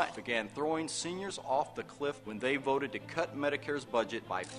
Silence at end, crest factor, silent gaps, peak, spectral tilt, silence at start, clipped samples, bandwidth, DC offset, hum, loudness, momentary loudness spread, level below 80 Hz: 0 s; 22 dB; none; -14 dBFS; -3.5 dB/octave; 0 s; under 0.1%; 13.5 kHz; under 0.1%; none; -35 LUFS; 5 LU; -70 dBFS